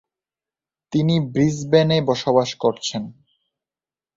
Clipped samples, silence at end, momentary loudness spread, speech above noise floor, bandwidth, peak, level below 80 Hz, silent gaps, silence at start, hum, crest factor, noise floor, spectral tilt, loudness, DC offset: under 0.1%; 1.05 s; 10 LU; over 71 dB; 7.8 kHz; -2 dBFS; -56 dBFS; none; 0.9 s; none; 20 dB; under -90 dBFS; -6 dB/octave; -20 LUFS; under 0.1%